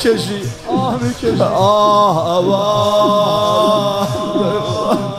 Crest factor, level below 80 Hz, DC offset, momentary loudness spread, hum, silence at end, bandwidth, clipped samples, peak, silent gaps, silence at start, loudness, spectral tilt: 12 dB; -44 dBFS; under 0.1%; 7 LU; none; 0 s; 14.5 kHz; under 0.1%; -2 dBFS; none; 0 s; -14 LUFS; -5.5 dB/octave